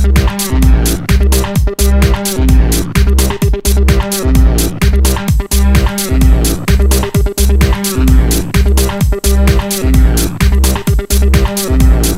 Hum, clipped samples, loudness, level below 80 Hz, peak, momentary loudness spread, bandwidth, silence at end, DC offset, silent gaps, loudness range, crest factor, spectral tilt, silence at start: none; 0.6%; -11 LUFS; -10 dBFS; 0 dBFS; 3 LU; 16.5 kHz; 0 s; under 0.1%; none; 0 LU; 10 dB; -5 dB/octave; 0 s